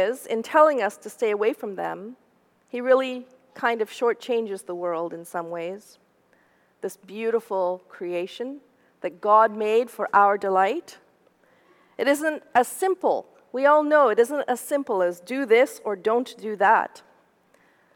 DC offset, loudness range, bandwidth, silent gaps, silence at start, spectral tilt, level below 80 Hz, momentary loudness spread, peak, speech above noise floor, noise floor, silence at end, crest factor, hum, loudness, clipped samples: under 0.1%; 9 LU; 18 kHz; none; 0 s; -4 dB/octave; -82 dBFS; 16 LU; -4 dBFS; 39 dB; -62 dBFS; 1 s; 20 dB; none; -23 LUFS; under 0.1%